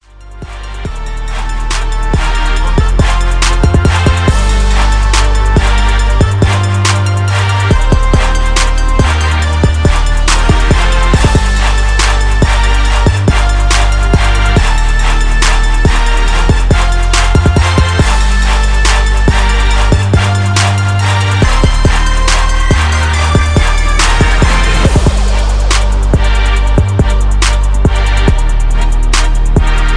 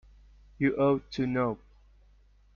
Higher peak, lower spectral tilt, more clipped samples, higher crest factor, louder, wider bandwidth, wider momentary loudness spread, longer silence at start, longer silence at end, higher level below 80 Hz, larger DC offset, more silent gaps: first, 0 dBFS vs -14 dBFS; second, -4.5 dB/octave vs -6.5 dB/octave; neither; second, 8 dB vs 18 dB; first, -11 LUFS vs -29 LUFS; first, 10.5 kHz vs 7 kHz; second, 3 LU vs 7 LU; second, 0.2 s vs 0.6 s; second, 0 s vs 1 s; first, -10 dBFS vs -56 dBFS; neither; neither